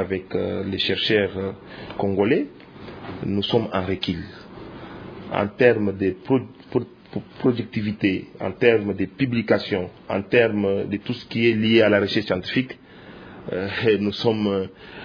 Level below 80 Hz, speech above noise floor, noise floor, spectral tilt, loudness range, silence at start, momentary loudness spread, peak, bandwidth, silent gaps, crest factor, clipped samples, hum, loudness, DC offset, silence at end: -56 dBFS; 21 dB; -43 dBFS; -7.5 dB/octave; 4 LU; 0 s; 19 LU; -2 dBFS; 5.4 kHz; none; 22 dB; under 0.1%; none; -22 LUFS; under 0.1%; 0 s